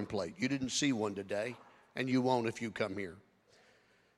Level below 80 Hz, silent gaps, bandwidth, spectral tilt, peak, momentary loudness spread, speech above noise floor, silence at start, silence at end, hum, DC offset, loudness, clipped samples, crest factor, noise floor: -70 dBFS; none; 12 kHz; -4.5 dB/octave; -18 dBFS; 12 LU; 33 dB; 0 s; 1 s; none; under 0.1%; -35 LUFS; under 0.1%; 20 dB; -68 dBFS